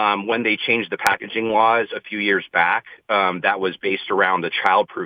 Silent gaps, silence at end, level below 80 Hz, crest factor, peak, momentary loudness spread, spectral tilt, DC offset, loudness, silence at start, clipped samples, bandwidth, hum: none; 0 s; -64 dBFS; 18 dB; -2 dBFS; 5 LU; -4 dB/octave; under 0.1%; -19 LUFS; 0 s; under 0.1%; 19.5 kHz; none